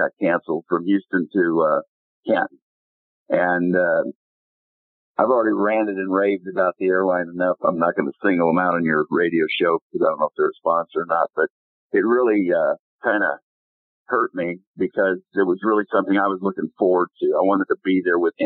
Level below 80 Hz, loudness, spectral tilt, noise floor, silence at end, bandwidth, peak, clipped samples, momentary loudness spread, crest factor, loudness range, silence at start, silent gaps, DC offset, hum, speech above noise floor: -70 dBFS; -21 LUFS; -11 dB/octave; under -90 dBFS; 0 s; 4.3 kHz; -2 dBFS; under 0.1%; 6 LU; 18 dB; 3 LU; 0 s; 1.88-2.23 s, 2.62-3.26 s, 4.15-5.15 s, 9.82-9.90 s, 11.50-11.90 s, 12.79-12.99 s, 13.42-14.06 s, 14.67-14.74 s; under 0.1%; none; over 70 dB